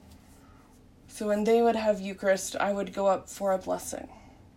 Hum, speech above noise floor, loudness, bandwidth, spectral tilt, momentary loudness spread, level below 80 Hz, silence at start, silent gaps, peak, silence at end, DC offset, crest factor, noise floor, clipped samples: none; 28 dB; -28 LUFS; 16 kHz; -4.5 dB/octave; 14 LU; -60 dBFS; 0.1 s; none; -14 dBFS; 0.3 s; under 0.1%; 16 dB; -55 dBFS; under 0.1%